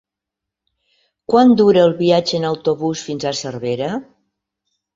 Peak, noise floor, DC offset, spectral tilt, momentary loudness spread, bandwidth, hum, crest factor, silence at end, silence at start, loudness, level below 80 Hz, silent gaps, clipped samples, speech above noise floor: -2 dBFS; -83 dBFS; under 0.1%; -5.5 dB/octave; 12 LU; 7.8 kHz; none; 16 dB; 0.9 s; 1.3 s; -16 LUFS; -56 dBFS; none; under 0.1%; 68 dB